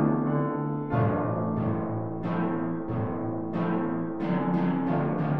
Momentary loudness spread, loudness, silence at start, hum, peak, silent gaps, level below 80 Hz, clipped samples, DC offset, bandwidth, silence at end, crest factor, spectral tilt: 5 LU; -28 LUFS; 0 s; none; -14 dBFS; none; -54 dBFS; under 0.1%; 0.6%; 5 kHz; 0 s; 14 dB; -11 dB/octave